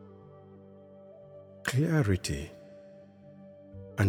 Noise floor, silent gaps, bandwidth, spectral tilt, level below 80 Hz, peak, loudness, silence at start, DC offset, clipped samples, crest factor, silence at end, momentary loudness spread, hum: -53 dBFS; none; 16.5 kHz; -6 dB/octave; -54 dBFS; -12 dBFS; -30 LUFS; 0 s; under 0.1%; under 0.1%; 22 dB; 0 s; 25 LU; none